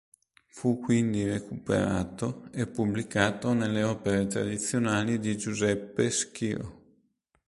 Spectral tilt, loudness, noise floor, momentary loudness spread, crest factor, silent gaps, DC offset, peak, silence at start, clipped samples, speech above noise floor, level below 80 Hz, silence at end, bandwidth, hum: -5 dB/octave; -29 LUFS; -71 dBFS; 7 LU; 20 dB; none; under 0.1%; -8 dBFS; 0.55 s; under 0.1%; 43 dB; -54 dBFS; 0.75 s; 11.5 kHz; none